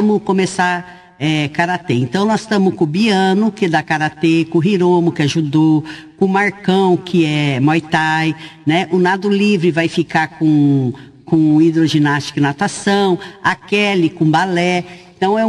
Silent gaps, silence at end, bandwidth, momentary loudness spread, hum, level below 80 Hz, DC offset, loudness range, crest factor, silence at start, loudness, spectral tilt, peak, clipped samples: none; 0 s; 11.5 kHz; 5 LU; none; -54 dBFS; under 0.1%; 1 LU; 12 dB; 0 s; -15 LUFS; -6 dB/octave; -2 dBFS; under 0.1%